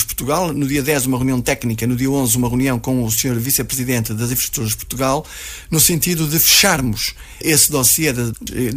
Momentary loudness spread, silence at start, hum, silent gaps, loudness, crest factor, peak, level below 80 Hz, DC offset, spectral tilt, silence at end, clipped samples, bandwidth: 11 LU; 0 s; none; none; -16 LUFS; 16 dB; -2 dBFS; -38 dBFS; under 0.1%; -3.5 dB/octave; 0 s; under 0.1%; 16 kHz